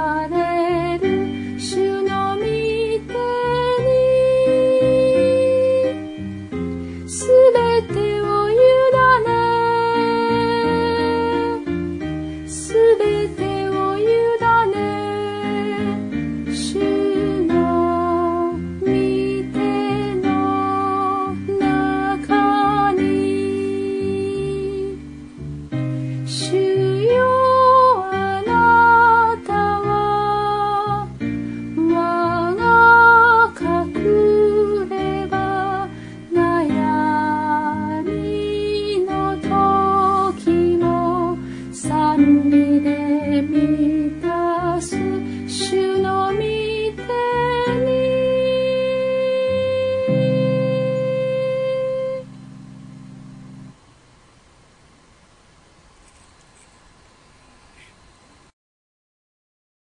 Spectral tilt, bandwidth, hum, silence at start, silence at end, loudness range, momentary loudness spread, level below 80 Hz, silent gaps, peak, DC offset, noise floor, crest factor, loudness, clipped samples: -6 dB/octave; 10.5 kHz; none; 0 s; 6.1 s; 6 LU; 11 LU; -46 dBFS; none; 0 dBFS; under 0.1%; -51 dBFS; 18 dB; -18 LUFS; under 0.1%